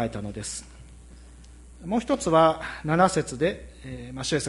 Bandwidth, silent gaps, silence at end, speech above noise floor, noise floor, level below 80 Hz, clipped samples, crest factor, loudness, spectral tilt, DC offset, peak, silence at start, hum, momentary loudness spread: 11.5 kHz; none; 0 s; 22 dB; -47 dBFS; -46 dBFS; under 0.1%; 20 dB; -25 LUFS; -5 dB/octave; under 0.1%; -6 dBFS; 0 s; none; 19 LU